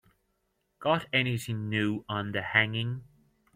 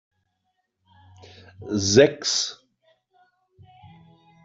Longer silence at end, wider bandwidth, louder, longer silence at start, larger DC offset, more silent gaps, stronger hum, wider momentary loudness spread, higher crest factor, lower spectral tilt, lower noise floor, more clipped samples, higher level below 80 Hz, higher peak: second, 0.5 s vs 1.9 s; first, 16 kHz vs 8 kHz; second, -29 LUFS vs -20 LUFS; second, 0.8 s vs 1.6 s; neither; neither; neither; second, 9 LU vs 13 LU; about the same, 24 dB vs 24 dB; first, -5.5 dB/octave vs -3.5 dB/octave; about the same, -76 dBFS vs -75 dBFS; neither; second, -66 dBFS vs -60 dBFS; second, -8 dBFS vs -2 dBFS